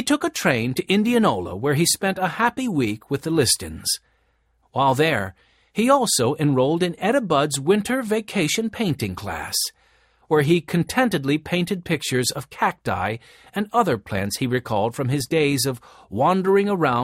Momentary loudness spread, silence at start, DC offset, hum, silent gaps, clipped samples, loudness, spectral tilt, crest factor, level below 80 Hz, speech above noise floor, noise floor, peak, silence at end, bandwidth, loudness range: 7 LU; 0 s; under 0.1%; none; none; under 0.1%; -21 LUFS; -4.5 dB/octave; 18 dB; -54 dBFS; 43 dB; -65 dBFS; -4 dBFS; 0 s; 16.5 kHz; 3 LU